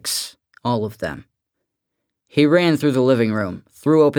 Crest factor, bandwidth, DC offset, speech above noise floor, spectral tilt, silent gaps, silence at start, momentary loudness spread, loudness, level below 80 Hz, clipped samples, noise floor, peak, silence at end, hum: 18 dB; 19 kHz; under 0.1%; 61 dB; -5.5 dB/octave; none; 0.05 s; 14 LU; -19 LUFS; -58 dBFS; under 0.1%; -79 dBFS; -2 dBFS; 0 s; none